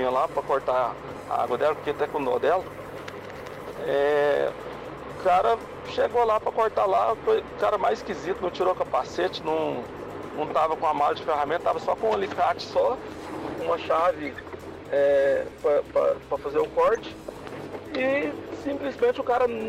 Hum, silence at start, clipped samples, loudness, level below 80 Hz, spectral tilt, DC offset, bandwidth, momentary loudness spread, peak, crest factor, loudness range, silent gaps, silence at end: none; 0 s; under 0.1%; -25 LUFS; -56 dBFS; -5.5 dB/octave; under 0.1%; 15 kHz; 15 LU; -14 dBFS; 12 dB; 3 LU; none; 0 s